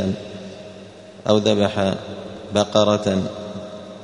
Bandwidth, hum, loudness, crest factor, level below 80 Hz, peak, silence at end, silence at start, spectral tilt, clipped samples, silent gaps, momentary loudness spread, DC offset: 10.5 kHz; none; -20 LUFS; 20 dB; -56 dBFS; -2 dBFS; 0 s; 0 s; -5.5 dB/octave; under 0.1%; none; 20 LU; under 0.1%